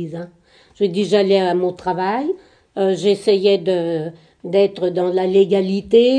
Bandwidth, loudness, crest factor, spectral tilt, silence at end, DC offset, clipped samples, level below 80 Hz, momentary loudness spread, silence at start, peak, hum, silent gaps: 10 kHz; -18 LUFS; 16 dB; -6.5 dB/octave; 0 s; under 0.1%; under 0.1%; -58 dBFS; 15 LU; 0 s; -2 dBFS; none; none